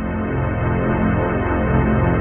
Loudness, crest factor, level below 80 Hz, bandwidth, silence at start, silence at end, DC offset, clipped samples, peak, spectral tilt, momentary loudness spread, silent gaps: -19 LUFS; 12 dB; -28 dBFS; 3.4 kHz; 0 s; 0 s; under 0.1%; under 0.1%; -6 dBFS; -12 dB/octave; 4 LU; none